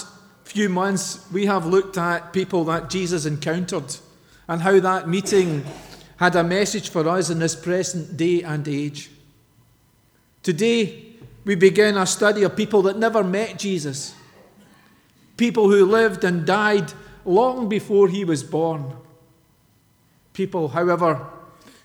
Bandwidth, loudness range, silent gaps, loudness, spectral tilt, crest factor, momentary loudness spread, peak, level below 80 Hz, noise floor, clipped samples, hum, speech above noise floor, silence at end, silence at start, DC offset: 17 kHz; 6 LU; none; -20 LUFS; -5 dB/octave; 20 dB; 12 LU; -2 dBFS; -58 dBFS; -59 dBFS; under 0.1%; none; 39 dB; 0.45 s; 0 s; under 0.1%